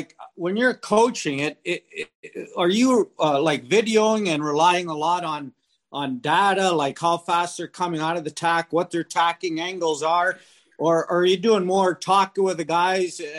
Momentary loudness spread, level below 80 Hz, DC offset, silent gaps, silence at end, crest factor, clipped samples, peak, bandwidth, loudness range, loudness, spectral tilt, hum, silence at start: 10 LU; -70 dBFS; under 0.1%; 2.15-2.23 s; 0 s; 16 dB; under 0.1%; -6 dBFS; 15.5 kHz; 3 LU; -22 LUFS; -4 dB/octave; none; 0 s